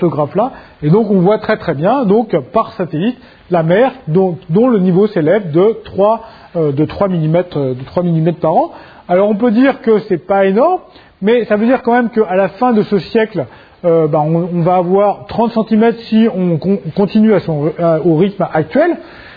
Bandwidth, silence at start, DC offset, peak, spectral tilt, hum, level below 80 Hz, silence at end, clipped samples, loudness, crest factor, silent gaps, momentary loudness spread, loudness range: 5 kHz; 0 s; under 0.1%; 0 dBFS; -10.5 dB/octave; none; -48 dBFS; 0 s; under 0.1%; -13 LUFS; 12 dB; none; 7 LU; 2 LU